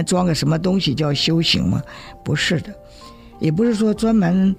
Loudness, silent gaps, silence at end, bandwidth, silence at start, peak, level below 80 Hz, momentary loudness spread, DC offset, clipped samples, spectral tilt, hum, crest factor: -18 LUFS; none; 0 s; 15.5 kHz; 0 s; -4 dBFS; -42 dBFS; 8 LU; under 0.1%; under 0.1%; -5.5 dB/octave; none; 14 dB